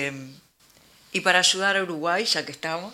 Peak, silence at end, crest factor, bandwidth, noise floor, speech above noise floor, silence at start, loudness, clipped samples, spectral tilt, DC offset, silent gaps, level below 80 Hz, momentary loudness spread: -2 dBFS; 0 s; 24 dB; 16.5 kHz; -57 dBFS; 33 dB; 0 s; -22 LUFS; under 0.1%; -1.5 dB/octave; under 0.1%; none; -72 dBFS; 12 LU